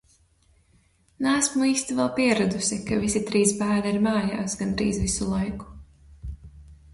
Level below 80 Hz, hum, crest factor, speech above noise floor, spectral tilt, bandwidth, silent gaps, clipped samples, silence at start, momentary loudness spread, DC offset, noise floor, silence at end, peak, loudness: -44 dBFS; none; 18 dB; 38 dB; -4 dB/octave; 11.5 kHz; none; under 0.1%; 1.2 s; 19 LU; under 0.1%; -62 dBFS; 0.2 s; -8 dBFS; -24 LUFS